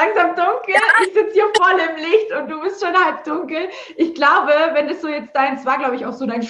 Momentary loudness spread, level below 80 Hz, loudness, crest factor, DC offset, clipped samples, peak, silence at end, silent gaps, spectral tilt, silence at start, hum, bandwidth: 11 LU; -68 dBFS; -17 LUFS; 16 dB; under 0.1%; under 0.1%; -2 dBFS; 0 s; none; -3.5 dB/octave; 0 s; none; 11.5 kHz